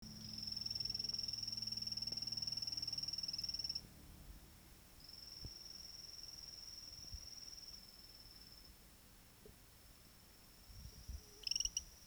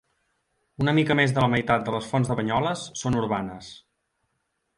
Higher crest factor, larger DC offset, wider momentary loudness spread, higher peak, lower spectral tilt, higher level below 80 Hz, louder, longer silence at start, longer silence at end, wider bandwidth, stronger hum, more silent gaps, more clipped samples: first, 24 dB vs 18 dB; neither; first, 21 LU vs 9 LU; second, -26 dBFS vs -8 dBFS; second, -1 dB/octave vs -6 dB/octave; second, -64 dBFS vs -52 dBFS; second, -44 LUFS vs -24 LUFS; second, 0 s vs 0.8 s; second, 0 s vs 1 s; first, over 20 kHz vs 11.5 kHz; neither; neither; neither